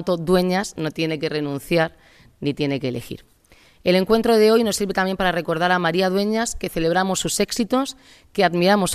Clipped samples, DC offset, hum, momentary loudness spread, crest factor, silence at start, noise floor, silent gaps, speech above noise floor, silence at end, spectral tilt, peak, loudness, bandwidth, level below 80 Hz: under 0.1%; under 0.1%; none; 10 LU; 18 dB; 0 s; -53 dBFS; none; 33 dB; 0 s; -4.5 dB/octave; -2 dBFS; -20 LUFS; 14.5 kHz; -46 dBFS